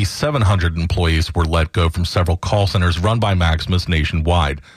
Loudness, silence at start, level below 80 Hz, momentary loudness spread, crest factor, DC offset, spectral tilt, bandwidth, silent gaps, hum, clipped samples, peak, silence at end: -17 LUFS; 0 s; -26 dBFS; 3 LU; 10 dB; under 0.1%; -6 dB/octave; 13 kHz; none; none; under 0.1%; -6 dBFS; 0.15 s